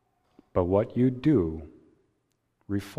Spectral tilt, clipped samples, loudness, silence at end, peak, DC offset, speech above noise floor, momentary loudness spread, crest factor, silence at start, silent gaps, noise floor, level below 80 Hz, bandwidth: -9 dB/octave; under 0.1%; -26 LUFS; 0.05 s; -10 dBFS; under 0.1%; 49 dB; 10 LU; 18 dB; 0.55 s; none; -75 dBFS; -52 dBFS; 14 kHz